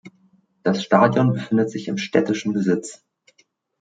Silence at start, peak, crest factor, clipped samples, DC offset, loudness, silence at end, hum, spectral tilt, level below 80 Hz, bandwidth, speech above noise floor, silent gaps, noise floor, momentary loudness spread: 0.05 s; -2 dBFS; 20 dB; under 0.1%; under 0.1%; -20 LUFS; 0.85 s; none; -6.5 dB/octave; -66 dBFS; 9.2 kHz; 43 dB; none; -63 dBFS; 9 LU